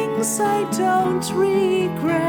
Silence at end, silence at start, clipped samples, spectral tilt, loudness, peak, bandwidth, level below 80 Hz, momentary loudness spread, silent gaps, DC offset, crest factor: 0 s; 0 s; under 0.1%; -4.5 dB/octave; -20 LUFS; -8 dBFS; 19.5 kHz; -56 dBFS; 2 LU; none; under 0.1%; 12 dB